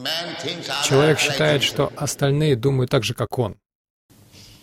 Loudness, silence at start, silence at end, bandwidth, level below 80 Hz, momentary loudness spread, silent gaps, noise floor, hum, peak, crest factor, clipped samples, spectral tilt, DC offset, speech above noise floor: -20 LUFS; 0 s; 0.2 s; 16.5 kHz; -50 dBFS; 9 LU; 3.75-4.09 s; -47 dBFS; none; -4 dBFS; 16 dB; under 0.1%; -4.5 dB/octave; under 0.1%; 27 dB